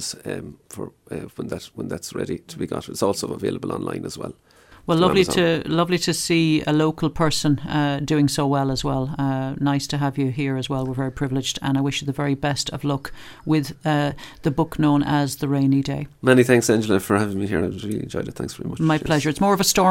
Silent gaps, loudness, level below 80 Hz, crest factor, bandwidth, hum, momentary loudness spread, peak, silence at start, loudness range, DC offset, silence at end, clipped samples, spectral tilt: none; -22 LUFS; -46 dBFS; 22 dB; 16 kHz; none; 14 LU; 0 dBFS; 0 s; 8 LU; under 0.1%; 0 s; under 0.1%; -5 dB/octave